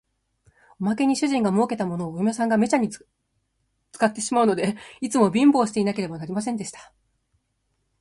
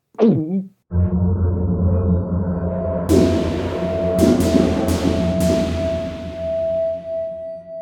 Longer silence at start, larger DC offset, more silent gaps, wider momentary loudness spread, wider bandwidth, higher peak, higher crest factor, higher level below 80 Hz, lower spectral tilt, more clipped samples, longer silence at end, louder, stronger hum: first, 0.8 s vs 0.2 s; neither; neither; about the same, 11 LU vs 10 LU; second, 11.5 kHz vs 17 kHz; second, -6 dBFS vs -2 dBFS; about the same, 18 dB vs 18 dB; second, -64 dBFS vs -32 dBFS; second, -5.5 dB/octave vs -7.5 dB/octave; neither; first, 1.2 s vs 0 s; second, -23 LUFS vs -19 LUFS; neither